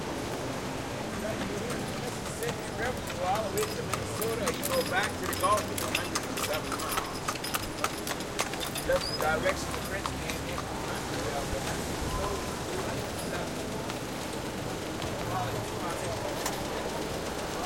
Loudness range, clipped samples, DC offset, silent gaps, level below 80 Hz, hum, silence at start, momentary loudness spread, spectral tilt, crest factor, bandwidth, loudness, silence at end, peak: 4 LU; under 0.1%; 0.1%; none; -48 dBFS; none; 0 s; 6 LU; -3.5 dB/octave; 22 dB; 17 kHz; -32 LUFS; 0 s; -10 dBFS